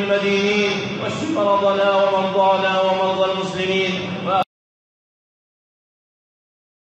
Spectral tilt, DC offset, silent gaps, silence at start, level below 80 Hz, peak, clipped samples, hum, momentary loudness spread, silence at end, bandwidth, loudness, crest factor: -5 dB/octave; under 0.1%; none; 0 s; -60 dBFS; -4 dBFS; under 0.1%; none; 6 LU; 2.45 s; 8.4 kHz; -19 LUFS; 16 dB